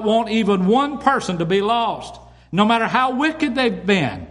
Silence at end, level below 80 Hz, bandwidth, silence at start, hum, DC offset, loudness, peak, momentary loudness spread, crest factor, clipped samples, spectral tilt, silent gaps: 0 s; -50 dBFS; 11.5 kHz; 0 s; none; under 0.1%; -18 LUFS; -2 dBFS; 5 LU; 16 dB; under 0.1%; -5.5 dB/octave; none